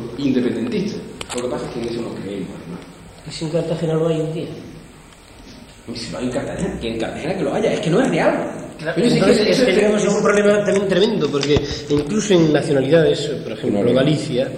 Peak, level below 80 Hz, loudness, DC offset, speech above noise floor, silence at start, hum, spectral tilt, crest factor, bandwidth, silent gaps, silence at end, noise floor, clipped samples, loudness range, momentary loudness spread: -2 dBFS; -44 dBFS; -18 LUFS; under 0.1%; 24 dB; 0 s; none; -5.5 dB/octave; 16 dB; 14.5 kHz; none; 0 s; -42 dBFS; under 0.1%; 10 LU; 14 LU